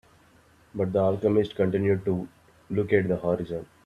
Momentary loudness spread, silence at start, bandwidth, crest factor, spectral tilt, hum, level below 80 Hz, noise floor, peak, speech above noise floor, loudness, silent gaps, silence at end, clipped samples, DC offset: 9 LU; 0.75 s; 9.8 kHz; 20 dB; -9 dB/octave; none; -58 dBFS; -58 dBFS; -6 dBFS; 33 dB; -26 LUFS; none; 0.2 s; under 0.1%; under 0.1%